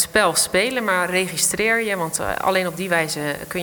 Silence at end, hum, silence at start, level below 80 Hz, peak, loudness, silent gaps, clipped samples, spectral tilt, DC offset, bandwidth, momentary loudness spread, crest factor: 0 s; none; 0 s; -50 dBFS; -4 dBFS; -20 LUFS; none; under 0.1%; -2.5 dB/octave; under 0.1%; 19.5 kHz; 6 LU; 18 dB